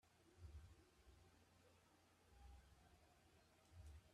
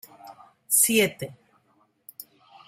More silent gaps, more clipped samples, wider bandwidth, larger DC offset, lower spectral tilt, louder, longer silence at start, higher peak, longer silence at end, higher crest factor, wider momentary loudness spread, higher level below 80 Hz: neither; neither; second, 13 kHz vs 16 kHz; neither; first, -5 dB/octave vs -2 dB/octave; second, -66 LUFS vs -21 LUFS; second, 0.05 s vs 0.25 s; second, -50 dBFS vs -6 dBFS; second, 0 s vs 0.45 s; about the same, 18 dB vs 22 dB; second, 6 LU vs 26 LU; about the same, -72 dBFS vs -72 dBFS